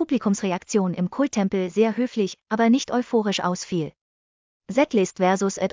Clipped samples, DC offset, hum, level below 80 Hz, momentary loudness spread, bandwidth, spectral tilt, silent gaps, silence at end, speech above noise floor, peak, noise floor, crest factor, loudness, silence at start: under 0.1%; under 0.1%; none; -64 dBFS; 7 LU; 7.6 kHz; -5.5 dB/octave; 4.01-4.61 s; 0.05 s; over 68 dB; -6 dBFS; under -90 dBFS; 16 dB; -23 LUFS; 0 s